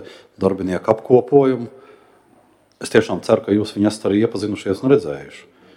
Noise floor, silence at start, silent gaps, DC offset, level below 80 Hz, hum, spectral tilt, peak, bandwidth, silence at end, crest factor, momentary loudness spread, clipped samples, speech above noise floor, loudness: -54 dBFS; 0 s; none; under 0.1%; -56 dBFS; none; -6.5 dB/octave; 0 dBFS; 12.5 kHz; 0.35 s; 18 dB; 13 LU; under 0.1%; 37 dB; -18 LUFS